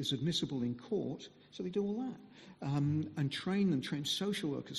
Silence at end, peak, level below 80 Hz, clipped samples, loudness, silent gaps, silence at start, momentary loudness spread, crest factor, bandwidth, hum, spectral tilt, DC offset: 0 s; -22 dBFS; -70 dBFS; under 0.1%; -36 LUFS; none; 0 s; 11 LU; 14 dB; 13 kHz; none; -5.5 dB/octave; under 0.1%